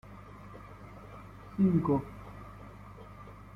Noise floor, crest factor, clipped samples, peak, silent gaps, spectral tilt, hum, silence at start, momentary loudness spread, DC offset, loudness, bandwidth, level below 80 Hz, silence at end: -49 dBFS; 20 dB; under 0.1%; -16 dBFS; none; -10 dB/octave; 50 Hz at -45 dBFS; 0.1 s; 22 LU; under 0.1%; -30 LUFS; 5.8 kHz; -56 dBFS; 0.05 s